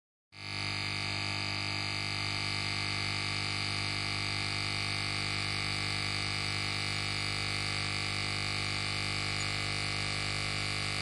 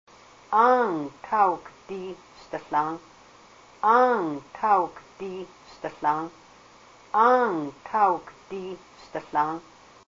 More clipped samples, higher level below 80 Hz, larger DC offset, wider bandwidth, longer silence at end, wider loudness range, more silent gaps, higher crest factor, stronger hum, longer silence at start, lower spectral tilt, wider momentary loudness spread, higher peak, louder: neither; first, -52 dBFS vs -66 dBFS; neither; first, 11.5 kHz vs 7.6 kHz; second, 0 s vs 0.5 s; about the same, 0 LU vs 1 LU; neither; about the same, 16 dB vs 20 dB; first, 50 Hz at -40 dBFS vs none; second, 0.3 s vs 0.5 s; second, -3 dB/octave vs -6 dB/octave; second, 1 LU vs 19 LU; second, -18 dBFS vs -6 dBFS; second, -32 LUFS vs -24 LUFS